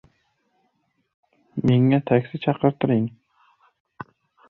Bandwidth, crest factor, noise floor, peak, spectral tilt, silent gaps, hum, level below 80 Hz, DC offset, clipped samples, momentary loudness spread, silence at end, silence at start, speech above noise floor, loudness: 4.3 kHz; 20 dB; -70 dBFS; -4 dBFS; -10 dB/octave; none; none; -58 dBFS; under 0.1%; under 0.1%; 24 LU; 1.4 s; 1.55 s; 50 dB; -21 LUFS